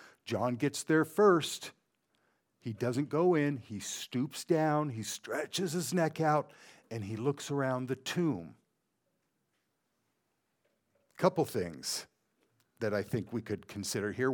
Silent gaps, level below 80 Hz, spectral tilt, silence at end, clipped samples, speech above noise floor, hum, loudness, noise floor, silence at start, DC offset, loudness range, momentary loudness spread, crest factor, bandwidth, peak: none; -74 dBFS; -5 dB/octave; 0 s; under 0.1%; 48 dB; none; -33 LUFS; -81 dBFS; 0 s; under 0.1%; 7 LU; 12 LU; 22 dB; 19 kHz; -12 dBFS